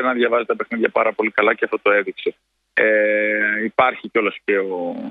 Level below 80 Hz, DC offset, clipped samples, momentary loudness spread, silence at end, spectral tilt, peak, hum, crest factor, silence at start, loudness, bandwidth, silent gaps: -66 dBFS; under 0.1%; under 0.1%; 8 LU; 0 s; -7 dB/octave; 0 dBFS; none; 18 dB; 0 s; -19 LUFS; 4.8 kHz; none